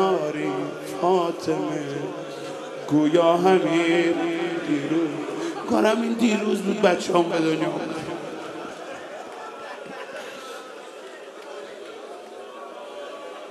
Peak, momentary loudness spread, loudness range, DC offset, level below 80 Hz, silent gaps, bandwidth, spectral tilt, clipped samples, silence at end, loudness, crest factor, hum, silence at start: -4 dBFS; 19 LU; 15 LU; under 0.1%; -70 dBFS; none; 13 kHz; -5.5 dB/octave; under 0.1%; 0 s; -23 LUFS; 20 dB; none; 0 s